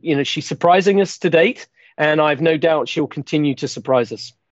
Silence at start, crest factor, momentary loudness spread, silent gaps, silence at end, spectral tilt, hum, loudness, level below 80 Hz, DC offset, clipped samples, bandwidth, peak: 0.05 s; 16 dB; 10 LU; none; 0.25 s; -5.5 dB/octave; none; -17 LUFS; -66 dBFS; under 0.1%; under 0.1%; 8.2 kHz; -2 dBFS